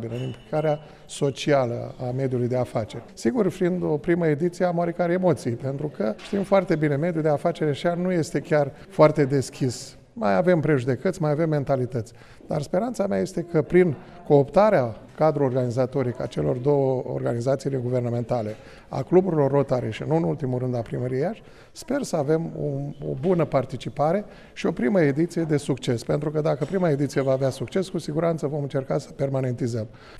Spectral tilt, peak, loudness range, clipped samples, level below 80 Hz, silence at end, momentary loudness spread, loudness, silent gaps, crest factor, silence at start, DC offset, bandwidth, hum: -7.5 dB/octave; -4 dBFS; 4 LU; under 0.1%; -52 dBFS; 0 s; 9 LU; -24 LUFS; none; 20 dB; 0 s; under 0.1%; 13 kHz; none